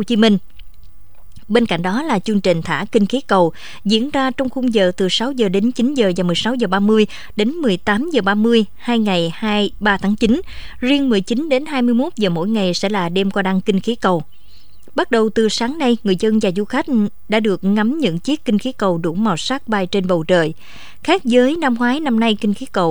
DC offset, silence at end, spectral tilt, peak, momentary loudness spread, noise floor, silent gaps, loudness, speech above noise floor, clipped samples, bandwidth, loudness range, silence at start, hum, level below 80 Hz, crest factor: 3%; 0 s; -5.5 dB/octave; 0 dBFS; 5 LU; -48 dBFS; none; -17 LUFS; 31 dB; under 0.1%; over 20 kHz; 2 LU; 0 s; none; -44 dBFS; 16 dB